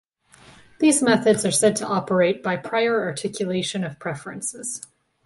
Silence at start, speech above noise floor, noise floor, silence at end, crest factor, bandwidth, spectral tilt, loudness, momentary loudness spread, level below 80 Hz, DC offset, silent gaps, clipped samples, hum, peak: 0.8 s; 30 dB; -52 dBFS; 0.4 s; 18 dB; 12 kHz; -4 dB/octave; -22 LUFS; 13 LU; -62 dBFS; under 0.1%; none; under 0.1%; none; -4 dBFS